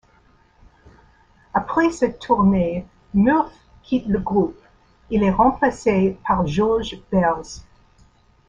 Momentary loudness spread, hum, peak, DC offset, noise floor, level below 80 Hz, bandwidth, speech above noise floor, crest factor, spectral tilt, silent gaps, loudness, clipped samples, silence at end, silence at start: 9 LU; none; -4 dBFS; under 0.1%; -56 dBFS; -42 dBFS; 8 kHz; 37 dB; 18 dB; -7 dB/octave; none; -20 LUFS; under 0.1%; 0.9 s; 1.55 s